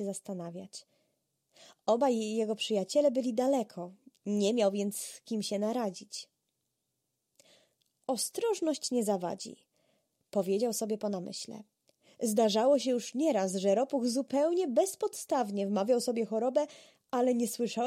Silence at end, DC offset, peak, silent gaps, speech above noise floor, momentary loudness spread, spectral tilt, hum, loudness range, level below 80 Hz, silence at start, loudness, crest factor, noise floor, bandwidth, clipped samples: 0 s; under 0.1%; -16 dBFS; none; 52 dB; 14 LU; -4.5 dB/octave; none; 7 LU; -84 dBFS; 0 s; -31 LUFS; 16 dB; -83 dBFS; 16 kHz; under 0.1%